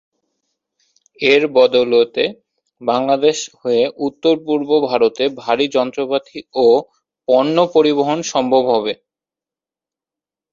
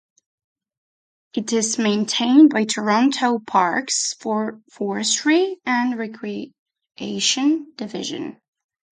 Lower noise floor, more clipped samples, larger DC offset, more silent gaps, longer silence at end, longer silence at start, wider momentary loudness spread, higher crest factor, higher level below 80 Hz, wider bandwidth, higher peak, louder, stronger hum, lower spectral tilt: about the same, -89 dBFS vs under -90 dBFS; neither; neither; second, none vs 6.59-6.66 s; first, 1.6 s vs 0.55 s; second, 1.2 s vs 1.35 s; second, 8 LU vs 15 LU; about the same, 16 dB vs 18 dB; first, -62 dBFS vs -70 dBFS; second, 7.6 kHz vs 9.6 kHz; about the same, -2 dBFS vs -4 dBFS; first, -16 LUFS vs -20 LUFS; neither; about the same, -4 dB/octave vs -3 dB/octave